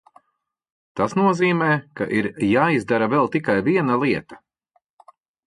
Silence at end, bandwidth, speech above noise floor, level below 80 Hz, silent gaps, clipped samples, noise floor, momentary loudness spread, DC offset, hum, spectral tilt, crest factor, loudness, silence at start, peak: 1.1 s; 11.5 kHz; 56 dB; -58 dBFS; none; under 0.1%; -75 dBFS; 6 LU; under 0.1%; none; -7 dB/octave; 16 dB; -20 LUFS; 0.95 s; -4 dBFS